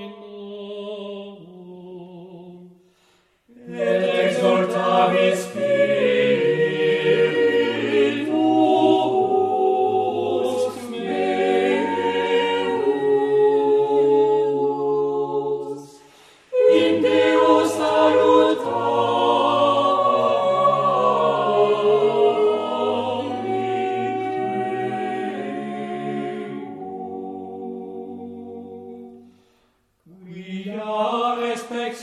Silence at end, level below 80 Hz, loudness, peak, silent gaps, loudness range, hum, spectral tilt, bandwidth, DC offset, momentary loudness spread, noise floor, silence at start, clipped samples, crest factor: 0 s; -70 dBFS; -20 LUFS; -4 dBFS; none; 15 LU; none; -5.5 dB/octave; 12.5 kHz; under 0.1%; 17 LU; -64 dBFS; 0 s; under 0.1%; 16 dB